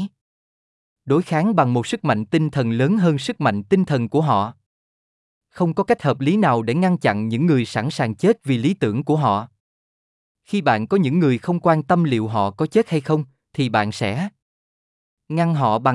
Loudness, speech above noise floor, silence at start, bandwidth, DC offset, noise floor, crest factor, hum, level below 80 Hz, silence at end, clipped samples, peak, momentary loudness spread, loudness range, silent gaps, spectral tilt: -20 LUFS; over 71 dB; 0 s; 12 kHz; under 0.1%; under -90 dBFS; 16 dB; none; -64 dBFS; 0 s; under 0.1%; -4 dBFS; 6 LU; 2 LU; 0.21-0.96 s, 4.66-5.41 s, 9.60-10.35 s, 14.42-15.17 s; -7.5 dB/octave